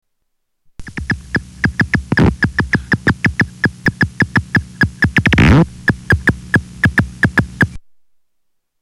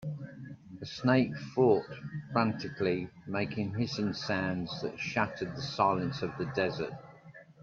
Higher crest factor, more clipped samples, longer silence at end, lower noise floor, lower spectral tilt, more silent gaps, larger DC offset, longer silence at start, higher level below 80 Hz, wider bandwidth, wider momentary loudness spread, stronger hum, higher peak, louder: second, 12 dB vs 20 dB; neither; first, 1.05 s vs 0.1 s; first, -67 dBFS vs -54 dBFS; about the same, -6.5 dB/octave vs -6.5 dB/octave; neither; neither; first, 0.8 s vs 0 s; first, -28 dBFS vs -66 dBFS; first, 14.5 kHz vs 7.4 kHz; second, 8 LU vs 15 LU; neither; first, -2 dBFS vs -12 dBFS; first, -15 LUFS vs -32 LUFS